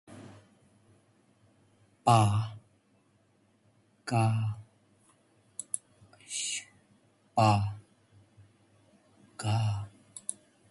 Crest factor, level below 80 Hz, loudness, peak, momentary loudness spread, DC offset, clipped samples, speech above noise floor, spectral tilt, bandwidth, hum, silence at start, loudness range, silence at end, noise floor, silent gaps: 22 dB; -60 dBFS; -31 LUFS; -10 dBFS; 23 LU; under 0.1%; under 0.1%; 42 dB; -5 dB/octave; 11.5 kHz; none; 0.1 s; 5 LU; 0.4 s; -68 dBFS; none